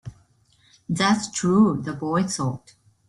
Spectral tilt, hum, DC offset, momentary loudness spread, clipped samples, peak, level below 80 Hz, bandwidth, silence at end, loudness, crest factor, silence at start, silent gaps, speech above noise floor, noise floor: -5 dB/octave; none; under 0.1%; 12 LU; under 0.1%; -8 dBFS; -58 dBFS; 11.5 kHz; 0.5 s; -22 LUFS; 16 dB; 0.05 s; none; 38 dB; -60 dBFS